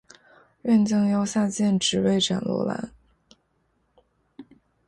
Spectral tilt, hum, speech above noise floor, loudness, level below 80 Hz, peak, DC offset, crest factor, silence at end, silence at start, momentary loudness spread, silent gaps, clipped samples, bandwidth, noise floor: -5 dB/octave; none; 47 dB; -23 LUFS; -60 dBFS; -10 dBFS; under 0.1%; 16 dB; 0.45 s; 0.65 s; 11 LU; none; under 0.1%; 11.5 kHz; -70 dBFS